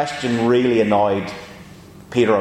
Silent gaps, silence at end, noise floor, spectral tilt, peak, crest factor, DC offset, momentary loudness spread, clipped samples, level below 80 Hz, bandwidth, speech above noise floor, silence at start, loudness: none; 0 s; -41 dBFS; -6 dB/octave; -2 dBFS; 16 dB; under 0.1%; 16 LU; under 0.1%; -54 dBFS; 11.5 kHz; 24 dB; 0 s; -18 LUFS